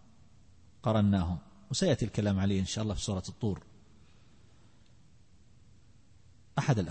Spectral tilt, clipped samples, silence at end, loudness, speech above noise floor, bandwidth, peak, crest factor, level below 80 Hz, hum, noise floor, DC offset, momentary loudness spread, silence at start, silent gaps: -6 dB/octave; under 0.1%; 0 s; -32 LUFS; 32 dB; 8.8 kHz; -14 dBFS; 18 dB; -52 dBFS; none; -62 dBFS; 0.1%; 8 LU; 0.85 s; none